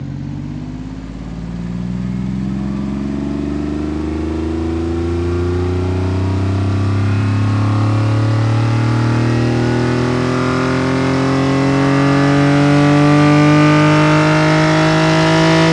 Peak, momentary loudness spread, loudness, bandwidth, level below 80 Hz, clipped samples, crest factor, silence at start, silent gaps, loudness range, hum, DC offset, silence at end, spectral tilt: 0 dBFS; 12 LU; -14 LUFS; 10.5 kHz; -34 dBFS; under 0.1%; 14 dB; 0 s; none; 10 LU; none; under 0.1%; 0 s; -7 dB/octave